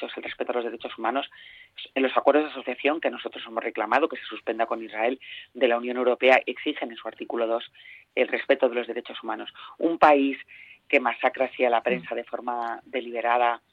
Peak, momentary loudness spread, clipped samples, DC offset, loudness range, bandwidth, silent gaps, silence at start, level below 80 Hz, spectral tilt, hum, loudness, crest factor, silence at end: -4 dBFS; 13 LU; under 0.1%; under 0.1%; 3 LU; 7.4 kHz; none; 0 s; -70 dBFS; -5.5 dB/octave; none; -25 LUFS; 22 dB; 0.15 s